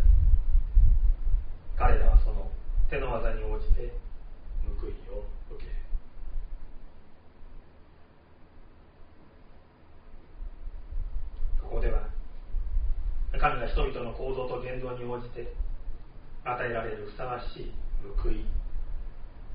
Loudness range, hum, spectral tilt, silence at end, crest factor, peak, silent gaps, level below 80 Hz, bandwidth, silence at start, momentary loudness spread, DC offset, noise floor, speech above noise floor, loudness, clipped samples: 18 LU; none; -6 dB/octave; 0 s; 20 dB; -6 dBFS; none; -28 dBFS; 4.4 kHz; 0 s; 19 LU; 0.1%; -53 dBFS; 24 dB; -33 LUFS; under 0.1%